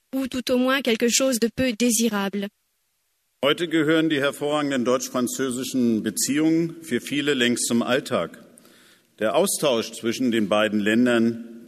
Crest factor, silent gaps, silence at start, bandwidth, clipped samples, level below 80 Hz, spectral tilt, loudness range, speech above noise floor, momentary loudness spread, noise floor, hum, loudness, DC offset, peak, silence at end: 16 dB; none; 0.15 s; 14 kHz; under 0.1%; -62 dBFS; -3.5 dB/octave; 1 LU; 50 dB; 7 LU; -72 dBFS; none; -22 LUFS; under 0.1%; -6 dBFS; 0 s